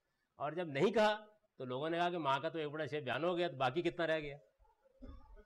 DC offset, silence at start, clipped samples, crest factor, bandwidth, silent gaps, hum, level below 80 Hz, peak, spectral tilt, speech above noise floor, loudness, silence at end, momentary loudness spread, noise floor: under 0.1%; 0.4 s; under 0.1%; 14 dB; 12 kHz; none; none; -66 dBFS; -24 dBFS; -6 dB/octave; 34 dB; -37 LUFS; 0.05 s; 11 LU; -71 dBFS